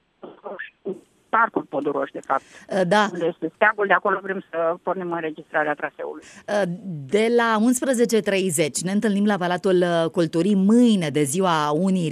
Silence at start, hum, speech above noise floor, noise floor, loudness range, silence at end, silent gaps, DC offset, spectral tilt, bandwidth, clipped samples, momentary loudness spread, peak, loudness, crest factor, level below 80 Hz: 0.25 s; none; 19 dB; -40 dBFS; 4 LU; 0 s; none; under 0.1%; -5 dB/octave; 14.5 kHz; under 0.1%; 14 LU; -4 dBFS; -21 LUFS; 18 dB; -70 dBFS